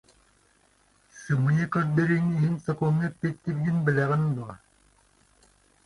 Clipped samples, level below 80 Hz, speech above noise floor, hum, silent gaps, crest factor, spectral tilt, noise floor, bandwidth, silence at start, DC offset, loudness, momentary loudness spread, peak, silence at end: under 0.1%; -60 dBFS; 39 dB; none; none; 18 dB; -8.5 dB/octave; -64 dBFS; 11 kHz; 1.15 s; under 0.1%; -26 LUFS; 7 LU; -10 dBFS; 1.3 s